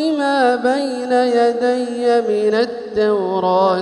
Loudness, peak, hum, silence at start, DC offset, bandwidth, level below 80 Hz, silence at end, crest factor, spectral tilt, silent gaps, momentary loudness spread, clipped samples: -17 LUFS; -2 dBFS; none; 0 s; under 0.1%; 11 kHz; -58 dBFS; 0 s; 14 dB; -5 dB/octave; none; 4 LU; under 0.1%